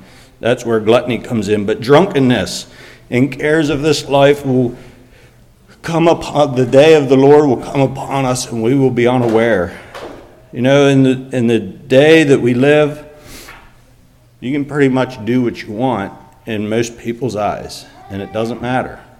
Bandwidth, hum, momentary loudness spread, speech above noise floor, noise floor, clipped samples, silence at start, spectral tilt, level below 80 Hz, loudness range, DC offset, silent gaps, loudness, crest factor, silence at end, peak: 15 kHz; none; 19 LU; 34 dB; -47 dBFS; 0.2%; 0.45 s; -6 dB/octave; -44 dBFS; 7 LU; under 0.1%; none; -13 LUFS; 14 dB; 0.2 s; 0 dBFS